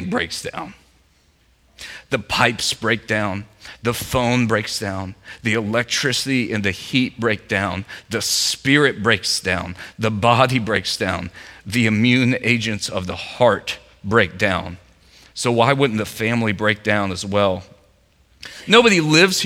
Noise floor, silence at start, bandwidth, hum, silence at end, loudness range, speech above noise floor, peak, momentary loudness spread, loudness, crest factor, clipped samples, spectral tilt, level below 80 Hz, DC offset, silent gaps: -58 dBFS; 0 s; 16.5 kHz; none; 0 s; 3 LU; 38 dB; 0 dBFS; 15 LU; -19 LUFS; 20 dB; under 0.1%; -4 dB/octave; -50 dBFS; under 0.1%; none